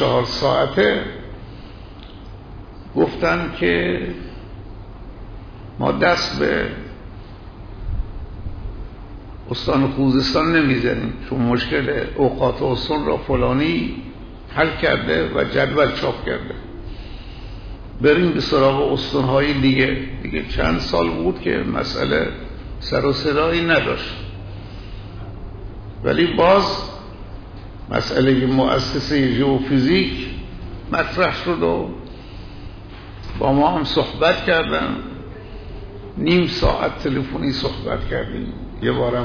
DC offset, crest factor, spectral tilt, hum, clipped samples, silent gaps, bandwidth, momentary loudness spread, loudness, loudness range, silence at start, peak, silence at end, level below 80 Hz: under 0.1%; 16 dB; -6.5 dB/octave; none; under 0.1%; none; 5.4 kHz; 21 LU; -19 LUFS; 5 LU; 0 s; -4 dBFS; 0 s; -34 dBFS